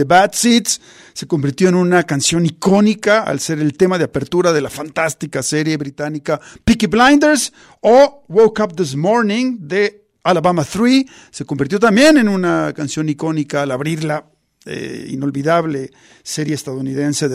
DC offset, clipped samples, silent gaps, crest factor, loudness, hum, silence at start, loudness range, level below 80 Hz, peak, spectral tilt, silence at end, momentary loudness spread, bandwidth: under 0.1%; under 0.1%; none; 14 dB; -15 LUFS; none; 0 s; 7 LU; -44 dBFS; 0 dBFS; -4.5 dB/octave; 0 s; 13 LU; 15.5 kHz